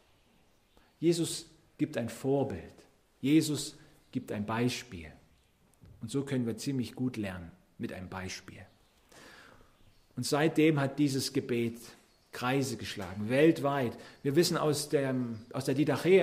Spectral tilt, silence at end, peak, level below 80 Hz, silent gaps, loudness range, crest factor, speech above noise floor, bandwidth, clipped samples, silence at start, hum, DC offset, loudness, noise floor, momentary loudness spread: -5.5 dB/octave; 0 s; -12 dBFS; -66 dBFS; none; 8 LU; 20 dB; 36 dB; 15.5 kHz; under 0.1%; 1 s; none; under 0.1%; -32 LUFS; -66 dBFS; 18 LU